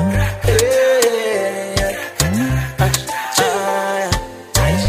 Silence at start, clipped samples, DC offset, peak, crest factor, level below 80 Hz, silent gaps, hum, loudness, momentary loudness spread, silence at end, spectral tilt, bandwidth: 0 s; under 0.1%; under 0.1%; 0 dBFS; 16 dB; -28 dBFS; none; none; -17 LUFS; 6 LU; 0 s; -4 dB/octave; 16 kHz